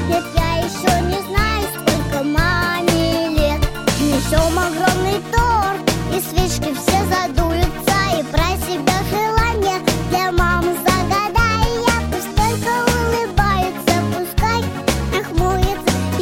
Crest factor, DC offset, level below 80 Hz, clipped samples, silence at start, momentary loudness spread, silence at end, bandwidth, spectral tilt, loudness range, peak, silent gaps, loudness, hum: 16 dB; under 0.1%; -24 dBFS; under 0.1%; 0 s; 3 LU; 0 s; 17 kHz; -4.5 dB/octave; 1 LU; 0 dBFS; none; -18 LUFS; none